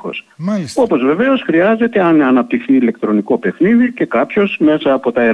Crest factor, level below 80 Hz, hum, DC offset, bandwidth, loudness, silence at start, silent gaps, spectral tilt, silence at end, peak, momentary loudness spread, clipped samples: 10 dB; -56 dBFS; none; under 0.1%; 11 kHz; -13 LUFS; 0.05 s; none; -7 dB/octave; 0 s; -2 dBFS; 6 LU; under 0.1%